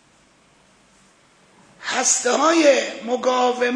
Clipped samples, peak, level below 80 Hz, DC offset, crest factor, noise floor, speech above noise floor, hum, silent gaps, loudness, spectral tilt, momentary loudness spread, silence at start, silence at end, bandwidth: under 0.1%; -2 dBFS; -70 dBFS; under 0.1%; 18 dB; -56 dBFS; 38 dB; none; none; -18 LUFS; -0.5 dB/octave; 10 LU; 1.8 s; 0 s; 10.5 kHz